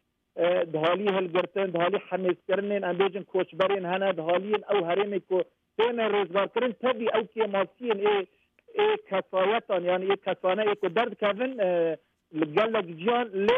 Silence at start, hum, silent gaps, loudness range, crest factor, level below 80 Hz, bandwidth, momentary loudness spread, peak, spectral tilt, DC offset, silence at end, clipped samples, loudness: 0.35 s; none; none; 1 LU; 16 dB; -74 dBFS; 5.8 kHz; 4 LU; -10 dBFS; -7.5 dB/octave; under 0.1%; 0 s; under 0.1%; -27 LUFS